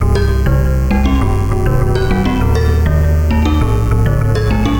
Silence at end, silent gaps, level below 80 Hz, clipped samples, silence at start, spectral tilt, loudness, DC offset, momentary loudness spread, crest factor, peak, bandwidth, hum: 0 s; none; -16 dBFS; under 0.1%; 0 s; -7.5 dB/octave; -14 LUFS; under 0.1%; 1 LU; 12 dB; 0 dBFS; 17 kHz; none